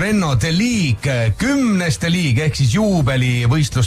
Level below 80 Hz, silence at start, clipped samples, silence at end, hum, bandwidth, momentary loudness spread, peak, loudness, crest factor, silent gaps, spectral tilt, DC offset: -34 dBFS; 0 s; under 0.1%; 0 s; none; 14.5 kHz; 2 LU; -6 dBFS; -16 LUFS; 8 dB; none; -5.5 dB/octave; under 0.1%